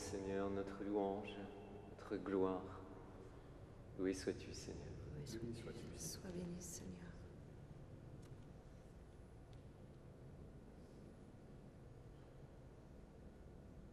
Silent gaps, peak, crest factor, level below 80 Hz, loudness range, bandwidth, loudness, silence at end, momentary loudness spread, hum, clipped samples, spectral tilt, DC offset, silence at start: none; -28 dBFS; 22 dB; -64 dBFS; 14 LU; 13 kHz; -49 LUFS; 0 s; 18 LU; none; under 0.1%; -5.5 dB/octave; under 0.1%; 0 s